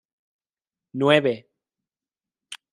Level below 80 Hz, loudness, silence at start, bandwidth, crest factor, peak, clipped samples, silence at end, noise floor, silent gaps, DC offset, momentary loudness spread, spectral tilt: -74 dBFS; -21 LUFS; 0.95 s; 11.5 kHz; 24 dB; -2 dBFS; under 0.1%; 0.2 s; under -90 dBFS; none; under 0.1%; 23 LU; -5.5 dB/octave